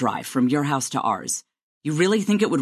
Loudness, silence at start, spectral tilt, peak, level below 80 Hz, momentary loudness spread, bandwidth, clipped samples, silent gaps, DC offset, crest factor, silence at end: -23 LUFS; 0 s; -4.5 dB/octave; -8 dBFS; -68 dBFS; 8 LU; 14 kHz; under 0.1%; 1.63-1.81 s; under 0.1%; 16 dB; 0 s